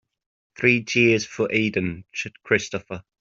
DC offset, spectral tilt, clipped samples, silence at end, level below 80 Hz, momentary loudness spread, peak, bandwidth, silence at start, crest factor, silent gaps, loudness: under 0.1%; -5 dB/octave; under 0.1%; 0.2 s; -60 dBFS; 13 LU; -2 dBFS; 7.8 kHz; 0.6 s; 20 dB; none; -22 LUFS